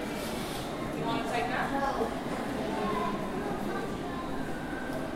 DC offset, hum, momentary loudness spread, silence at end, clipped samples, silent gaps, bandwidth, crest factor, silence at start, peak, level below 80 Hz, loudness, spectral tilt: under 0.1%; none; 5 LU; 0 s; under 0.1%; none; 16 kHz; 16 dB; 0 s; -18 dBFS; -48 dBFS; -33 LUFS; -5 dB/octave